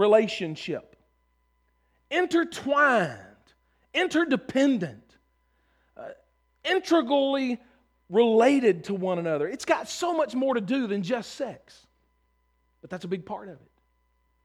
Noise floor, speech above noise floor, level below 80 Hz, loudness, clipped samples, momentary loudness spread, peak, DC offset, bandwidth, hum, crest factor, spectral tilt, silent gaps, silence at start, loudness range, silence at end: -70 dBFS; 45 dB; -68 dBFS; -26 LUFS; under 0.1%; 16 LU; -8 dBFS; under 0.1%; 13.5 kHz; none; 20 dB; -5 dB/octave; none; 0 s; 7 LU; 0.9 s